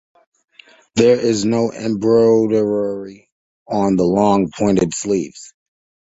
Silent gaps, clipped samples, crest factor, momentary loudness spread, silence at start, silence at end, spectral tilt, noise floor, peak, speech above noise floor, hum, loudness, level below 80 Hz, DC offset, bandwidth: 3.32-3.66 s; under 0.1%; 16 dB; 11 LU; 0.95 s; 0.65 s; -6 dB/octave; -44 dBFS; -2 dBFS; 28 dB; none; -16 LUFS; -50 dBFS; under 0.1%; 8 kHz